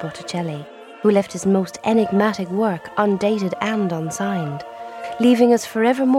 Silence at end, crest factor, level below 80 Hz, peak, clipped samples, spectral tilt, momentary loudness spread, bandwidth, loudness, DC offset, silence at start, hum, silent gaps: 0 s; 16 dB; -62 dBFS; -4 dBFS; under 0.1%; -6 dB/octave; 13 LU; 14.5 kHz; -20 LUFS; under 0.1%; 0 s; none; none